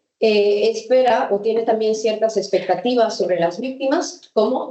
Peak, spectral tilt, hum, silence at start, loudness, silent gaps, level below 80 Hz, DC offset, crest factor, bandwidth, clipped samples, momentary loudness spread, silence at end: -4 dBFS; -4 dB/octave; none; 0.2 s; -19 LUFS; none; -72 dBFS; under 0.1%; 14 dB; 8.4 kHz; under 0.1%; 5 LU; 0 s